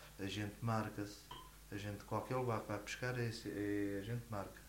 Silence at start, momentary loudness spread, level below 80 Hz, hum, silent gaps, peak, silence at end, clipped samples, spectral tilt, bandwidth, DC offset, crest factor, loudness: 0 s; 9 LU; -62 dBFS; none; none; -26 dBFS; 0 s; under 0.1%; -6 dB/octave; 16 kHz; under 0.1%; 18 dB; -43 LUFS